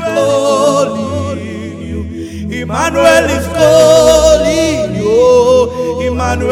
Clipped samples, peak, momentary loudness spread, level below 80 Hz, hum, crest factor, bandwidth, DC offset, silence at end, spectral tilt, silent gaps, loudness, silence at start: 0.7%; 0 dBFS; 15 LU; -28 dBFS; none; 10 dB; 16 kHz; under 0.1%; 0 s; -4.5 dB/octave; none; -10 LUFS; 0 s